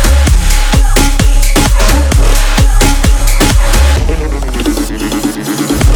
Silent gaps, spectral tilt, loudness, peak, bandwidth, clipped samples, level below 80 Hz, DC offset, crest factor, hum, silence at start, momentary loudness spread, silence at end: none; -4.5 dB/octave; -11 LUFS; 0 dBFS; 19.5 kHz; 0.3%; -8 dBFS; under 0.1%; 8 dB; none; 0 s; 6 LU; 0 s